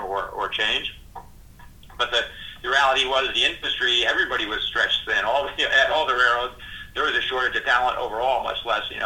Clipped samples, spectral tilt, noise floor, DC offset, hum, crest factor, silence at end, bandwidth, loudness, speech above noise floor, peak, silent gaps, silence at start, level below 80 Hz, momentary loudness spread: under 0.1%; -1.5 dB/octave; -45 dBFS; under 0.1%; none; 18 dB; 0 s; 18.5 kHz; -21 LUFS; 22 dB; -4 dBFS; none; 0 s; -48 dBFS; 9 LU